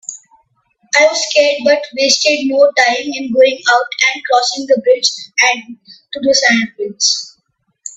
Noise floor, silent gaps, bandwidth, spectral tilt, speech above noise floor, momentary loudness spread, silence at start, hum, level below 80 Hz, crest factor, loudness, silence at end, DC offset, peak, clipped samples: -64 dBFS; none; 8.4 kHz; -1 dB/octave; 51 dB; 9 LU; 0.1 s; none; -64 dBFS; 14 dB; -12 LUFS; 0.05 s; under 0.1%; 0 dBFS; under 0.1%